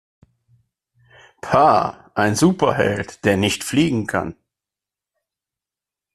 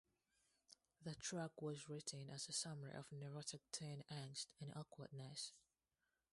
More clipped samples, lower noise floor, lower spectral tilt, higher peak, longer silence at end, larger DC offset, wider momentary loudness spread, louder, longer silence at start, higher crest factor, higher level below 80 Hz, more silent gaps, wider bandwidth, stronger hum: neither; about the same, -88 dBFS vs under -90 dBFS; first, -5 dB/octave vs -3.5 dB/octave; first, -2 dBFS vs -32 dBFS; first, 1.85 s vs 0.7 s; neither; about the same, 10 LU vs 9 LU; first, -18 LUFS vs -51 LUFS; first, 1.45 s vs 0.7 s; about the same, 20 dB vs 22 dB; first, -52 dBFS vs -84 dBFS; neither; first, 14 kHz vs 11.5 kHz; neither